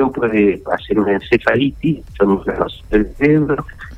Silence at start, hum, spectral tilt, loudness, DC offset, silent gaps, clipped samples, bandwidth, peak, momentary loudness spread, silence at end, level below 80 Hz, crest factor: 0 s; none; -8.5 dB/octave; -16 LUFS; under 0.1%; none; under 0.1%; 8 kHz; 0 dBFS; 7 LU; 0 s; -34 dBFS; 16 dB